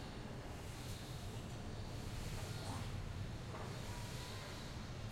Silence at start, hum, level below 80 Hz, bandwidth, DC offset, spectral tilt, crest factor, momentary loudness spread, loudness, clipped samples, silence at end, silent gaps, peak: 0 s; none; -54 dBFS; 16.5 kHz; under 0.1%; -5 dB/octave; 14 dB; 3 LU; -48 LUFS; under 0.1%; 0 s; none; -32 dBFS